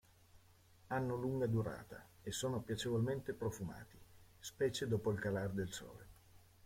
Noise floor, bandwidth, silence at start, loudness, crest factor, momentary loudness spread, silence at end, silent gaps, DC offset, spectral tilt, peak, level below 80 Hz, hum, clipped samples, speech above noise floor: -66 dBFS; 16.5 kHz; 0.35 s; -41 LUFS; 16 dB; 15 LU; 0.25 s; none; under 0.1%; -5.5 dB/octave; -26 dBFS; -66 dBFS; none; under 0.1%; 26 dB